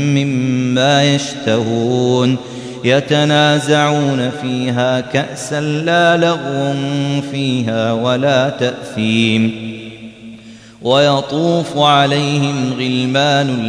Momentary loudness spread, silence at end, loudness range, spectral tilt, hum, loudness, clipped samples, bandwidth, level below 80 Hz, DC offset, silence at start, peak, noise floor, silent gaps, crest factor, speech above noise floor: 8 LU; 0 s; 2 LU; -5.5 dB/octave; none; -14 LUFS; under 0.1%; 11 kHz; -56 dBFS; under 0.1%; 0 s; 0 dBFS; -37 dBFS; none; 14 dB; 23 dB